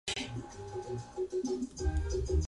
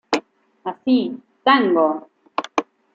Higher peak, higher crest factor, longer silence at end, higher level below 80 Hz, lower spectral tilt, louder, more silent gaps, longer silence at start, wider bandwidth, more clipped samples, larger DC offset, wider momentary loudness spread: second, -20 dBFS vs -2 dBFS; about the same, 14 dB vs 18 dB; second, 0 s vs 0.35 s; first, -38 dBFS vs -72 dBFS; about the same, -5.5 dB/octave vs -4.5 dB/octave; second, -37 LUFS vs -20 LUFS; neither; about the same, 0.05 s vs 0.1 s; first, 11.5 kHz vs 7.8 kHz; neither; neither; second, 9 LU vs 15 LU